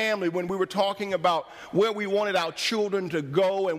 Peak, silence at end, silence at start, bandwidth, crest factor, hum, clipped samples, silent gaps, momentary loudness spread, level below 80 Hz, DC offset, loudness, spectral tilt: -10 dBFS; 0 s; 0 s; 15.5 kHz; 16 dB; none; under 0.1%; none; 3 LU; -68 dBFS; under 0.1%; -26 LUFS; -4.5 dB/octave